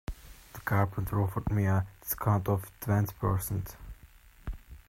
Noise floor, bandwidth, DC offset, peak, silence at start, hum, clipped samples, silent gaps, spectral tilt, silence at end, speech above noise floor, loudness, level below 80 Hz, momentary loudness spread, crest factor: -55 dBFS; 16 kHz; under 0.1%; -12 dBFS; 0.1 s; none; under 0.1%; none; -7 dB/octave; 0.1 s; 26 dB; -31 LUFS; -46 dBFS; 18 LU; 20 dB